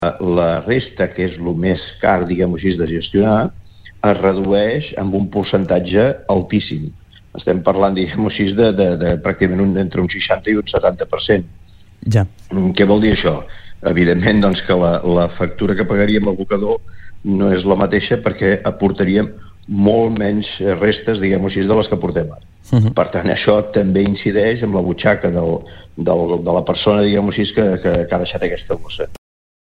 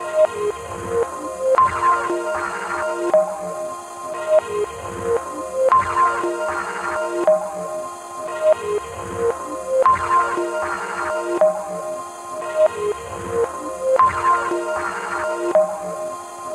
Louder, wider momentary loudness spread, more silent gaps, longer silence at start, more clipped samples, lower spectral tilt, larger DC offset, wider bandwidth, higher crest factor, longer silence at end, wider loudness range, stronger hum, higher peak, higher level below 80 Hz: first, -16 LUFS vs -21 LUFS; second, 7 LU vs 12 LU; neither; about the same, 0 s vs 0 s; neither; first, -8.5 dB/octave vs -4.5 dB/octave; neither; second, 7 kHz vs 13 kHz; about the same, 16 dB vs 18 dB; first, 0.6 s vs 0 s; about the same, 2 LU vs 2 LU; neither; first, 0 dBFS vs -4 dBFS; first, -38 dBFS vs -52 dBFS